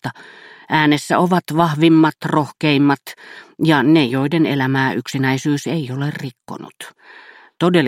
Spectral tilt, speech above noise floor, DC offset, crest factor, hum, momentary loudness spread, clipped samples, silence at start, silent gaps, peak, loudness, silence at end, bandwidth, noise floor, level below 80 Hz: -6 dB/octave; 25 dB; under 0.1%; 18 dB; none; 21 LU; under 0.1%; 0.05 s; none; 0 dBFS; -16 LUFS; 0 s; 15.5 kHz; -41 dBFS; -60 dBFS